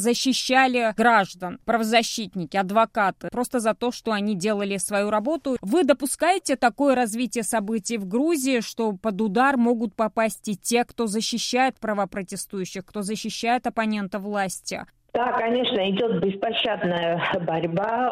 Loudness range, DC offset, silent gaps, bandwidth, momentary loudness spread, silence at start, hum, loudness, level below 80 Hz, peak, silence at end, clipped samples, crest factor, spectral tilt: 3 LU; under 0.1%; none; 16 kHz; 9 LU; 0 s; none; -23 LUFS; -60 dBFS; -4 dBFS; 0 s; under 0.1%; 20 dB; -4 dB/octave